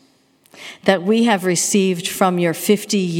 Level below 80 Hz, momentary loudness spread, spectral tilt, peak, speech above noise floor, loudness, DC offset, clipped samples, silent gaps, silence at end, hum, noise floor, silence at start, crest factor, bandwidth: -68 dBFS; 5 LU; -4 dB/octave; 0 dBFS; 39 dB; -17 LUFS; under 0.1%; under 0.1%; none; 0 s; none; -56 dBFS; 0.55 s; 18 dB; 17.5 kHz